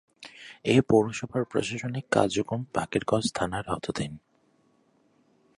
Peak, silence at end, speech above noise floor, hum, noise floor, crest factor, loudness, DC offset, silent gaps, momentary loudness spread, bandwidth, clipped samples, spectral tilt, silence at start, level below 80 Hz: -6 dBFS; 1.4 s; 39 dB; none; -66 dBFS; 22 dB; -27 LUFS; under 0.1%; none; 13 LU; 11.5 kHz; under 0.1%; -5.5 dB/octave; 0.2 s; -56 dBFS